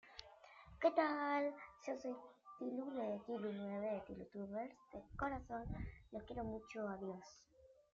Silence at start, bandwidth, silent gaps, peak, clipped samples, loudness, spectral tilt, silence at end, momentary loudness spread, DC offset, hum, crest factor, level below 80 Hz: 0.05 s; 7.4 kHz; none; -24 dBFS; under 0.1%; -45 LUFS; -5 dB/octave; 0.2 s; 19 LU; under 0.1%; none; 22 dB; -62 dBFS